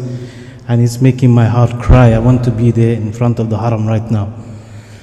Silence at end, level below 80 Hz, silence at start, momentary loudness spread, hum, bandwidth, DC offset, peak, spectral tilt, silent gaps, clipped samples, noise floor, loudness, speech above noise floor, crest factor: 0.05 s; -24 dBFS; 0 s; 20 LU; none; 11.5 kHz; under 0.1%; 0 dBFS; -8.5 dB/octave; none; under 0.1%; -32 dBFS; -12 LUFS; 21 dB; 12 dB